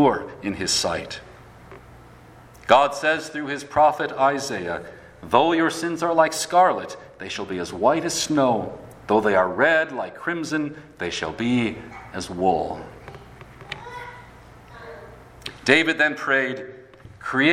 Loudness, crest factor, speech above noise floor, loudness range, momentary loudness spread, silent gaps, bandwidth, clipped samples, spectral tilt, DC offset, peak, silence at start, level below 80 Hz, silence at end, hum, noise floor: -22 LUFS; 22 dB; 25 dB; 6 LU; 19 LU; none; 16 kHz; under 0.1%; -3.5 dB/octave; under 0.1%; 0 dBFS; 0 s; -54 dBFS; 0 s; none; -47 dBFS